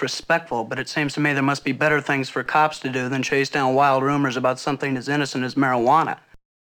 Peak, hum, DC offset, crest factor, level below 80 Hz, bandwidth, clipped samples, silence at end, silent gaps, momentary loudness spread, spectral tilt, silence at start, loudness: -6 dBFS; none; under 0.1%; 16 dB; -60 dBFS; 19 kHz; under 0.1%; 0.45 s; none; 7 LU; -5 dB/octave; 0 s; -21 LUFS